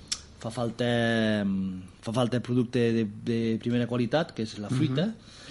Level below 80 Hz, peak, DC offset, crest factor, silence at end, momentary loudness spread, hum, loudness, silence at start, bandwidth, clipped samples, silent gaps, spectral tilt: -58 dBFS; -10 dBFS; under 0.1%; 18 dB; 0 s; 9 LU; none; -28 LUFS; 0 s; 11.5 kHz; under 0.1%; none; -6 dB/octave